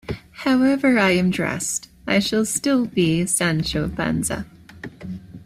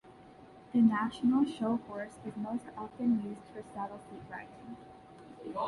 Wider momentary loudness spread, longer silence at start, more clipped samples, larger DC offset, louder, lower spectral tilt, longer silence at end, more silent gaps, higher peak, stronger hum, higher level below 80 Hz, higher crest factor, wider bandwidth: second, 18 LU vs 21 LU; about the same, 0.1 s vs 0.05 s; neither; neither; first, -20 LUFS vs -33 LUFS; second, -4.5 dB/octave vs -7 dB/octave; about the same, 0 s vs 0 s; neither; first, -4 dBFS vs -16 dBFS; neither; first, -46 dBFS vs -68 dBFS; about the same, 16 dB vs 18 dB; first, 15.5 kHz vs 11 kHz